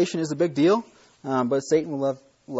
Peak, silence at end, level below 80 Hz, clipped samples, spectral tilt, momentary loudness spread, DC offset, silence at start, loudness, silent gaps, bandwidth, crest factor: -8 dBFS; 0 s; -68 dBFS; under 0.1%; -6 dB/octave; 8 LU; under 0.1%; 0 s; -24 LUFS; none; 8 kHz; 16 dB